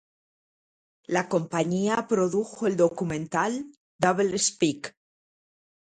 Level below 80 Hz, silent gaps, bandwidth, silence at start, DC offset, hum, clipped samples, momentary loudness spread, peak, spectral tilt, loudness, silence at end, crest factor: -64 dBFS; 3.77-3.99 s; 11.5 kHz; 1.1 s; under 0.1%; none; under 0.1%; 7 LU; -8 dBFS; -4.5 dB/octave; -26 LUFS; 1.05 s; 20 dB